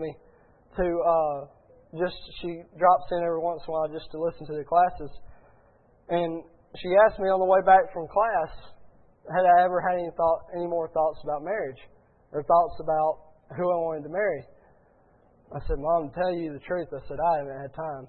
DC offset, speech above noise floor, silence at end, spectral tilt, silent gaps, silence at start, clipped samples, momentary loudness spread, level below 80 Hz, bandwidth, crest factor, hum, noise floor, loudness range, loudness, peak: under 0.1%; 35 dB; 0 s; -10 dB/octave; none; 0 s; under 0.1%; 16 LU; -48 dBFS; 4.4 kHz; 20 dB; none; -60 dBFS; 7 LU; -26 LUFS; -6 dBFS